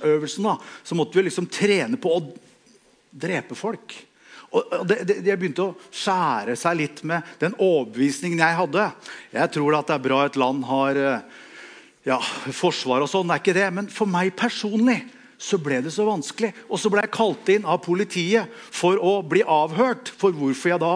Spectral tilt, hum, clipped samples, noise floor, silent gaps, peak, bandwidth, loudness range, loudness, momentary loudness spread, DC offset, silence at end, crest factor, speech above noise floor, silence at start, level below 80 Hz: -5 dB/octave; none; under 0.1%; -57 dBFS; none; -2 dBFS; 10.5 kHz; 5 LU; -23 LUFS; 8 LU; under 0.1%; 0 s; 20 dB; 34 dB; 0 s; -78 dBFS